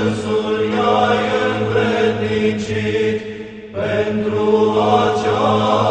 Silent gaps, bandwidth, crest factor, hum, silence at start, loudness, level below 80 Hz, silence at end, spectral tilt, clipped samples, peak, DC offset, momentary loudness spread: none; 9.2 kHz; 16 dB; none; 0 s; -17 LUFS; -48 dBFS; 0 s; -6 dB/octave; under 0.1%; 0 dBFS; under 0.1%; 6 LU